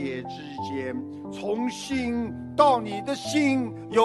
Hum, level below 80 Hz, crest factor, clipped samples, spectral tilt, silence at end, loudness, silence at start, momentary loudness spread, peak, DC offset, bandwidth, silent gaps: none; -56 dBFS; 22 dB; under 0.1%; -5 dB/octave; 0 s; -27 LUFS; 0 s; 14 LU; -4 dBFS; under 0.1%; 12 kHz; none